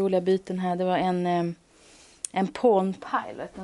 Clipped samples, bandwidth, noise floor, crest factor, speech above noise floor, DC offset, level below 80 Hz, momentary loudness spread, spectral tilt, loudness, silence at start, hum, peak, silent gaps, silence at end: under 0.1%; 11.5 kHz; -54 dBFS; 18 dB; 29 dB; under 0.1%; -64 dBFS; 11 LU; -6 dB/octave; -26 LUFS; 0 s; none; -8 dBFS; none; 0 s